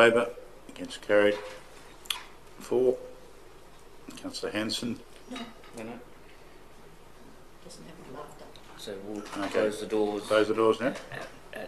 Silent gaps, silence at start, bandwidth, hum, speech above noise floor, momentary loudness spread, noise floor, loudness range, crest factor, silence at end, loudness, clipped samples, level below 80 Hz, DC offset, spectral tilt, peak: none; 0 s; 14 kHz; none; 21 dB; 23 LU; -49 dBFS; 16 LU; 24 dB; 0 s; -29 LUFS; under 0.1%; -60 dBFS; under 0.1%; -4 dB/octave; -8 dBFS